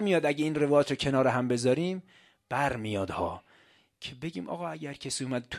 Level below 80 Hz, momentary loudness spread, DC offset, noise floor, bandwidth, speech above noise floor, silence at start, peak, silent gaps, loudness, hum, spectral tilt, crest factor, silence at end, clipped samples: -58 dBFS; 13 LU; under 0.1%; -63 dBFS; 15 kHz; 34 dB; 0 s; -10 dBFS; none; -29 LUFS; none; -5.5 dB/octave; 18 dB; 0 s; under 0.1%